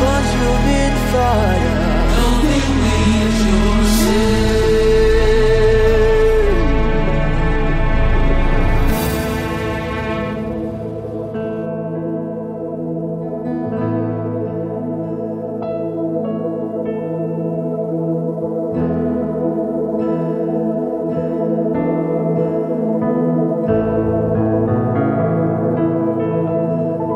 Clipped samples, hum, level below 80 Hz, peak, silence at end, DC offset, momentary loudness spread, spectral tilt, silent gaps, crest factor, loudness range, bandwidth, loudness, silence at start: under 0.1%; none; -22 dBFS; -2 dBFS; 0 s; under 0.1%; 9 LU; -6.5 dB/octave; none; 14 dB; 8 LU; 16 kHz; -18 LUFS; 0 s